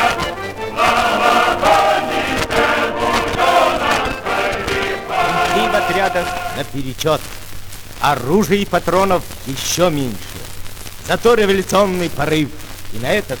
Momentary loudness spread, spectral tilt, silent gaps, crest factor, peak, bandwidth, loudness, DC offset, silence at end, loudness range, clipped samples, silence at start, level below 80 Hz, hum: 16 LU; -4 dB/octave; none; 14 dB; -2 dBFS; over 20 kHz; -16 LUFS; under 0.1%; 0 s; 4 LU; under 0.1%; 0 s; -36 dBFS; none